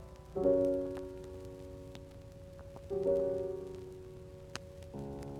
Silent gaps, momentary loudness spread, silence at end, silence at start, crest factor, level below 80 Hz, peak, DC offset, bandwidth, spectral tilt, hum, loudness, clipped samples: none; 20 LU; 0 s; 0 s; 20 dB; -56 dBFS; -18 dBFS; under 0.1%; 13.5 kHz; -7 dB/octave; none; -37 LUFS; under 0.1%